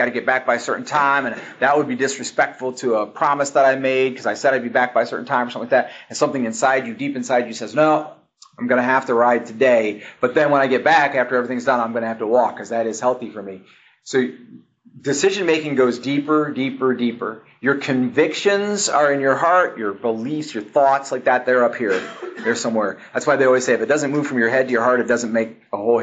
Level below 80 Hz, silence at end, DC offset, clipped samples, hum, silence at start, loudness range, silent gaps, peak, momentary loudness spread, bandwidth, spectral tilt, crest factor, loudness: -70 dBFS; 0 s; under 0.1%; under 0.1%; none; 0 s; 4 LU; none; -2 dBFS; 8 LU; 9.2 kHz; -4 dB/octave; 16 dB; -19 LUFS